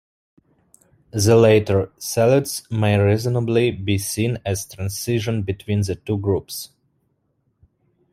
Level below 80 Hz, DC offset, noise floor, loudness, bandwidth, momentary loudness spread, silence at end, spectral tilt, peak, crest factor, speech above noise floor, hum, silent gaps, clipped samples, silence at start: -52 dBFS; under 0.1%; -68 dBFS; -20 LUFS; 16 kHz; 11 LU; 1.45 s; -5.5 dB/octave; -2 dBFS; 18 dB; 49 dB; none; none; under 0.1%; 1.15 s